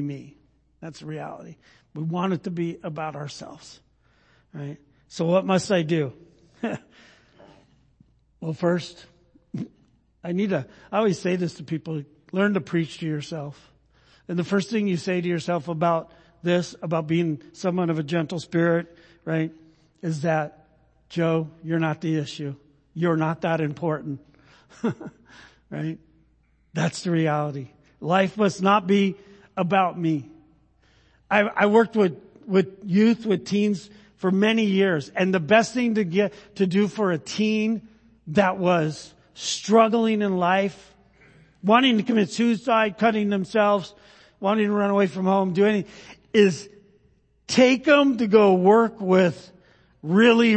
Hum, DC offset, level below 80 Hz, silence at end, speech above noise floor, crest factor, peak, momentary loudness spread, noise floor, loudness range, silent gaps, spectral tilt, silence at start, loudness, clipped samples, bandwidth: none; under 0.1%; -64 dBFS; 0 s; 40 dB; 22 dB; -2 dBFS; 17 LU; -62 dBFS; 10 LU; none; -6 dB/octave; 0 s; -23 LUFS; under 0.1%; 8.8 kHz